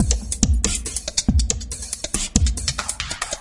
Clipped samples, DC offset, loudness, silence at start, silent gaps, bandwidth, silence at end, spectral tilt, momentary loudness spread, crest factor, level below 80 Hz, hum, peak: under 0.1%; under 0.1%; -22 LUFS; 0 s; none; 11.5 kHz; 0 s; -3 dB/octave; 6 LU; 22 dB; -26 dBFS; none; 0 dBFS